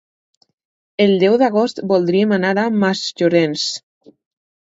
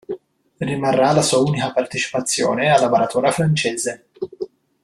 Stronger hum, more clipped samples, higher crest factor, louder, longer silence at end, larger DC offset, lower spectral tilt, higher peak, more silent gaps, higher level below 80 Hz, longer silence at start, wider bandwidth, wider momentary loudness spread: neither; neither; about the same, 16 dB vs 18 dB; about the same, -16 LUFS vs -18 LUFS; first, 0.95 s vs 0.35 s; neither; about the same, -5.5 dB/octave vs -4.5 dB/octave; about the same, 0 dBFS vs -2 dBFS; neither; second, -66 dBFS vs -56 dBFS; first, 1 s vs 0.1 s; second, 8 kHz vs 13 kHz; second, 8 LU vs 17 LU